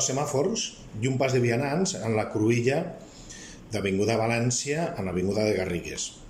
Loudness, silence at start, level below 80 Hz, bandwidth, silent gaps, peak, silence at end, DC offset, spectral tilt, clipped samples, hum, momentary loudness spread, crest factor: -27 LUFS; 0 s; -54 dBFS; 15.5 kHz; none; -10 dBFS; 0 s; under 0.1%; -4.5 dB/octave; under 0.1%; none; 11 LU; 16 dB